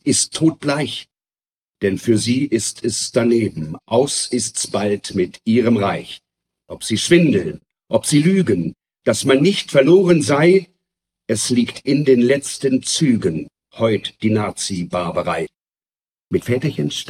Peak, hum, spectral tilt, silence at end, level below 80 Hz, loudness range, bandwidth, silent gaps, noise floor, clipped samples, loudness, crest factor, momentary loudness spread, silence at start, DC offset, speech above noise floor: -2 dBFS; none; -5 dB/octave; 0 s; -56 dBFS; 5 LU; 15 kHz; 1.58-1.62 s; under -90 dBFS; under 0.1%; -17 LUFS; 16 dB; 11 LU; 0.05 s; under 0.1%; over 73 dB